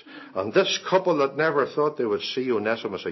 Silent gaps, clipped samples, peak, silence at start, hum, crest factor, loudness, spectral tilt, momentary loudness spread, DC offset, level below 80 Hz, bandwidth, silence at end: none; under 0.1%; -8 dBFS; 0.05 s; none; 18 dB; -24 LUFS; -4.5 dB/octave; 6 LU; under 0.1%; -68 dBFS; 6.2 kHz; 0 s